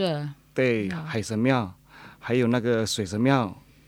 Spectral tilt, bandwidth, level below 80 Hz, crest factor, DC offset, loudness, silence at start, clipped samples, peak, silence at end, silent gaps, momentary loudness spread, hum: -5.5 dB/octave; 16.5 kHz; -60 dBFS; 18 dB; under 0.1%; -25 LUFS; 0 s; under 0.1%; -6 dBFS; 0.3 s; none; 10 LU; none